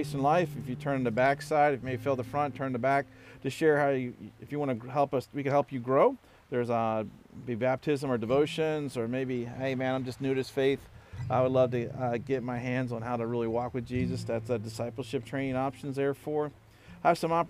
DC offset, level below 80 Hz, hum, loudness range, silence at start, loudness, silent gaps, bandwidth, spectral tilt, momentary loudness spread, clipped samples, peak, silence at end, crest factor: under 0.1%; -60 dBFS; none; 4 LU; 0 s; -30 LUFS; none; 15.5 kHz; -7 dB/octave; 10 LU; under 0.1%; -12 dBFS; 0 s; 18 dB